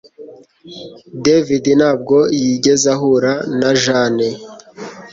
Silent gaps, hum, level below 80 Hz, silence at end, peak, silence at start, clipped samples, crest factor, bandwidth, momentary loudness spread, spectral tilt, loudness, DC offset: none; none; -54 dBFS; 0.05 s; 0 dBFS; 0.2 s; under 0.1%; 14 dB; 8 kHz; 20 LU; -4.5 dB/octave; -14 LUFS; under 0.1%